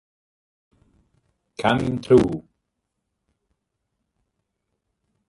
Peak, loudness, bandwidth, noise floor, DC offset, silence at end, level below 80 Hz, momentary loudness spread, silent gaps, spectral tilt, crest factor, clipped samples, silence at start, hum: -4 dBFS; -20 LUFS; 11.5 kHz; -79 dBFS; under 0.1%; 2.9 s; -50 dBFS; 16 LU; none; -7 dB/octave; 24 dB; under 0.1%; 1.6 s; none